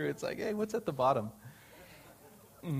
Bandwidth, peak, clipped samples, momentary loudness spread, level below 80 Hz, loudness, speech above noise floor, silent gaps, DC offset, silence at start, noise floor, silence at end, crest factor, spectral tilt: 15.5 kHz; -16 dBFS; under 0.1%; 24 LU; -68 dBFS; -34 LUFS; 24 dB; none; under 0.1%; 0 s; -58 dBFS; 0 s; 20 dB; -6.5 dB/octave